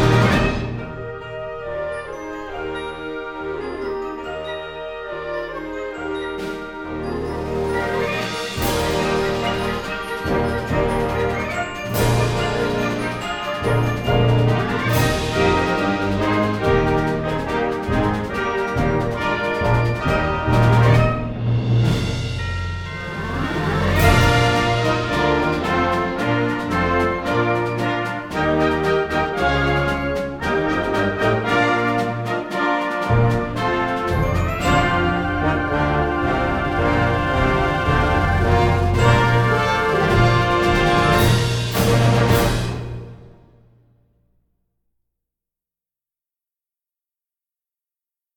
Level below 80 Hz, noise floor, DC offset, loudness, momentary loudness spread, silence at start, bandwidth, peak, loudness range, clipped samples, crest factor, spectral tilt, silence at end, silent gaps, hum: -32 dBFS; under -90 dBFS; under 0.1%; -20 LUFS; 12 LU; 0 s; 19 kHz; -2 dBFS; 11 LU; under 0.1%; 18 dB; -6 dB/octave; 5.05 s; none; none